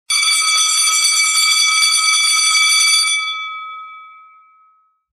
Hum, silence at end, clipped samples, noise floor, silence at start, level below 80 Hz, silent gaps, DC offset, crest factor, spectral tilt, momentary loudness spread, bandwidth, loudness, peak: none; 1 s; under 0.1%; -56 dBFS; 0.1 s; -70 dBFS; none; under 0.1%; 14 dB; 6.5 dB/octave; 14 LU; 16.5 kHz; -11 LUFS; 0 dBFS